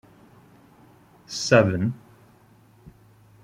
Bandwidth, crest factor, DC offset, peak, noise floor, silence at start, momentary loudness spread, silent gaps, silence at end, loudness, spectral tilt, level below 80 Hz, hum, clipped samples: 14.5 kHz; 24 dB; under 0.1%; -2 dBFS; -55 dBFS; 1.3 s; 17 LU; none; 1.45 s; -22 LUFS; -5.5 dB/octave; -60 dBFS; none; under 0.1%